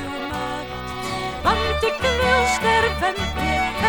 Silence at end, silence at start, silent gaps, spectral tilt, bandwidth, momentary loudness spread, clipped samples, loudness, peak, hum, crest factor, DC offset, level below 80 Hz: 0 s; 0 s; none; -4 dB/octave; 18 kHz; 10 LU; under 0.1%; -21 LUFS; -4 dBFS; none; 16 dB; under 0.1%; -34 dBFS